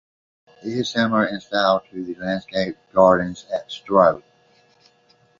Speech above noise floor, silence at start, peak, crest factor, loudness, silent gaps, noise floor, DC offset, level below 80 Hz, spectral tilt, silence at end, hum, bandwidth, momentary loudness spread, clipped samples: 39 dB; 0.65 s; -2 dBFS; 20 dB; -20 LUFS; none; -59 dBFS; under 0.1%; -56 dBFS; -5.5 dB/octave; 1.2 s; none; 7.4 kHz; 13 LU; under 0.1%